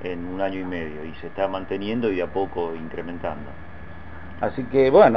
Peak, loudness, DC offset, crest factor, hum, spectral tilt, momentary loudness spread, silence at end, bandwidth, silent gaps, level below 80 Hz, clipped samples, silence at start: -2 dBFS; -25 LUFS; 1%; 22 dB; none; -9 dB/octave; 19 LU; 0 s; 5.8 kHz; none; -46 dBFS; under 0.1%; 0 s